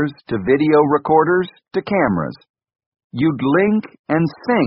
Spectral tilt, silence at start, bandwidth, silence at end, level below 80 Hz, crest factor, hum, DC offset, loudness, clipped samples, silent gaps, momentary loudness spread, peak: -6 dB/octave; 0 s; 5.6 kHz; 0 s; -52 dBFS; 16 dB; none; under 0.1%; -17 LUFS; under 0.1%; 2.49-2.54 s, 2.86-2.92 s, 3.04-3.10 s, 3.99-4.04 s; 10 LU; 0 dBFS